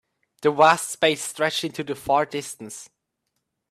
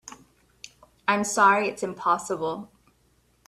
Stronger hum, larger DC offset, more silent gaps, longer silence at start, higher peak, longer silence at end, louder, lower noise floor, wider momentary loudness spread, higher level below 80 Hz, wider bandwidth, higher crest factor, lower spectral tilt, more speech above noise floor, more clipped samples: neither; neither; neither; first, 0.4 s vs 0.05 s; first, -2 dBFS vs -6 dBFS; about the same, 0.85 s vs 0.8 s; about the same, -22 LUFS vs -24 LUFS; first, -78 dBFS vs -65 dBFS; second, 18 LU vs 25 LU; about the same, -66 dBFS vs -66 dBFS; first, 15.5 kHz vs 14 kHz; about the same, 22 dB vs 22 dB; about the same, -3 dB/octave vs -3.5 dB/octave; first, 56 dB vs 41 dB; neither